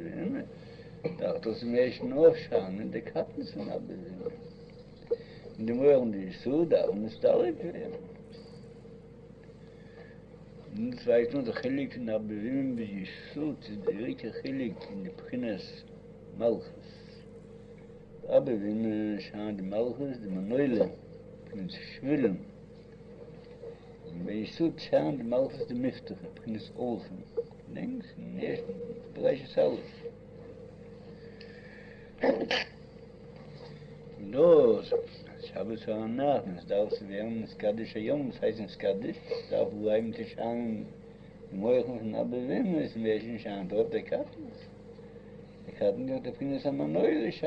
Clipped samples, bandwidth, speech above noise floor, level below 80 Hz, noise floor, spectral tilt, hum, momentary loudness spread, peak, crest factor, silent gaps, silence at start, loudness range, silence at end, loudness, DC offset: under 0.1%; 6.6 kHz; 20 dB; -62 dBFS; -51 dBFS; -8 dB/octave; none; 22 LU; -10 dBFS; 22 dB; none; 0 s; 8 LU; 0 s; -31 LUFS; under 0.1%